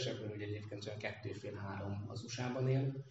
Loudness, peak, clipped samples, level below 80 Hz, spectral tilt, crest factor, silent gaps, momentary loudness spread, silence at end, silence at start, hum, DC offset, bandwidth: -42 LUFS; -24 dBFS; under 0.1%; -76 dBFS; -6 dB/octave; 16 dB; none; 10 LU; 0 s; 0 s; none; under 0.1%; 8 kHz